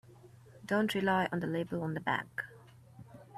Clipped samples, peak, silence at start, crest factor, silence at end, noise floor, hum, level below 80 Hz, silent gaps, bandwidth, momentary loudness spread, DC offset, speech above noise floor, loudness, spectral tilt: under 0.1%; -16 dBFS; 0.1 s; 18 dB; 0 s; -57 dBFS; none; -70 dBFS; none; 14 kHz; 20 LU; under 0.1%; 24 dB; -34 LUFS; -6 dB/octave